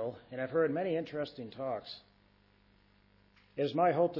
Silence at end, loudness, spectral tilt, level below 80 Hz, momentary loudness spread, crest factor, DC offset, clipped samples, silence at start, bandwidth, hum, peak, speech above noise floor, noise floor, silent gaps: 0 s; -34 LUFS; -5 dB/octave; -72 dBFS; 14 LU; 18 dB; under 0.1%; under 0.1%; 0 s; 6 kHz; 50 Hz at -70 dBFS; -18 dBFS; 33 dB; -67 dBFS; none